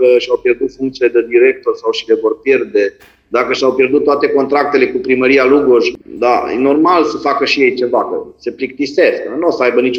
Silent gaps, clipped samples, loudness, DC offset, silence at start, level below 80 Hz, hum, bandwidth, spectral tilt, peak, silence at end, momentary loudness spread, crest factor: none; under 0.1%; -13 LUFS; under 0.1%; 0 s; -52 dBFS; none; 7.4 kHz; -5 dB/octave; 0 dBFS; 0 s; 8 LU; 12 dB